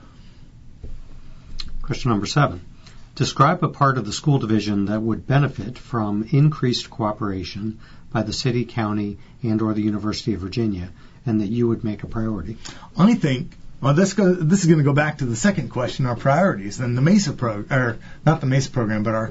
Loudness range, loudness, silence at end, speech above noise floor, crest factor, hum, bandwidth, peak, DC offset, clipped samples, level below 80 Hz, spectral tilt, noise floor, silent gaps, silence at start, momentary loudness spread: 5 LU; -21 LUFS; 0 s; 22 dB; 20 dB; none; 8 kHz; -2 dBFS; under 0.1%; under 0.1%; -40 dBFS; -6.5 dB/octave; -43 dBFS; none; 0.2 s; 13 LU